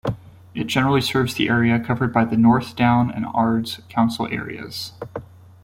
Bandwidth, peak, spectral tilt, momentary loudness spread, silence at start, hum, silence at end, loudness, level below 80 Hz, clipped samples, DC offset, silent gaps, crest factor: 16.5 kHz; -2 dBFS; -6 dB/octave; 14 LU; 0.05 s; none; 0.4 s; -20 LUFS; -50 dBFS; under 0.1%; under 0.1%; none; 18 dB